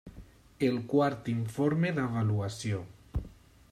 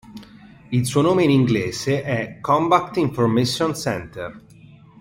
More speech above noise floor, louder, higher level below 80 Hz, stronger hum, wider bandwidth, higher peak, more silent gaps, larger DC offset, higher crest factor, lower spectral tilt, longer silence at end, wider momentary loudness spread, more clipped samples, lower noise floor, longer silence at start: second, 23 dB vs 27 dB; second, -31 LUFS vs -20 LUFS; about the same, -50 dBFS vs -52 dBFS; neither; second, 13.5 kHz vs 16.5 kHz; second, -14 dBFS vs -2 dBFS; neither; neither; about the same, 18 dB vs 18 dB; about the same, -7 dB/octave vs -6 dB/octave; second, 0.4 s vs 0.6 s; about the same, 12 LU vs 10 LU; neither; first, -53 dBFS vs -46 dBFS; about the same, 0.05 s vs 0.1 s